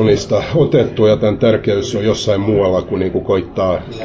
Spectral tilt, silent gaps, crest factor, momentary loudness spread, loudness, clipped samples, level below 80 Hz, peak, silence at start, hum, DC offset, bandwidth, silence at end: -6.5 dB/octave; none; 12 dB; 5 LU; -15 LUFS; under 0.1%; -36 dBFS; -2 dBFS; 0 s; none; under 0.1%; 8 kHz; 0 s